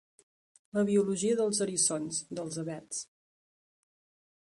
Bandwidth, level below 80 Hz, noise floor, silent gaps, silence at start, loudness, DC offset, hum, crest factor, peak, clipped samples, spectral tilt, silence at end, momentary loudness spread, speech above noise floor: 11.5 kHz; -74 dBFS; under -90 dBFS; none; 0.75 s; -31 LUFS; under 0.1%; none; 18 dB; -14 dBFS; under 0.1%; -4 dB/octave; 1.45 s; 11 LU; over 59 dB